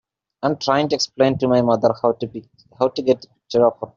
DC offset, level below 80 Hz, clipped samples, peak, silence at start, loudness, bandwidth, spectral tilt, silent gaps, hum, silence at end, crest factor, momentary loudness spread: under 0.1%; -58 dBFS; under 0.1%; -2 dBFS; 0.4 s; -19 LUFS; 7.6 kHz; -4.5 dB/octave; none; none; 0.1 s; 18 dB; 8 LU